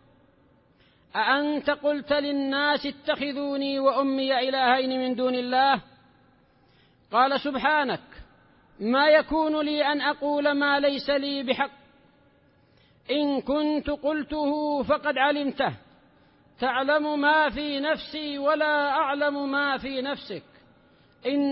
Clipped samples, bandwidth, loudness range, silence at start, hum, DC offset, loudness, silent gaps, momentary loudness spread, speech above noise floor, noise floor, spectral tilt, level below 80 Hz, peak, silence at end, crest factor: under 0.1%; 5.8 kHz; 4 LU; 1.15 s; none; under 0.1%; -25 LUFS; none; 7 LU; 36 dB; -61 dBFS; -8.5 dB/octave; -58 dBFS; -8 dBFS; 0 s; 18 dB